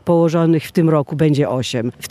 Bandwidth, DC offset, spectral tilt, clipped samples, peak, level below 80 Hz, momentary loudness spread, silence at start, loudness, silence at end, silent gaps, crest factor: 15 kHz; under 0.1%; -7 dB/octave; under 0.1%; -2 dBFS; -56 dBFS; 6 LU; 0.05 s; -16 LUFS; 0 s; none; 14 dB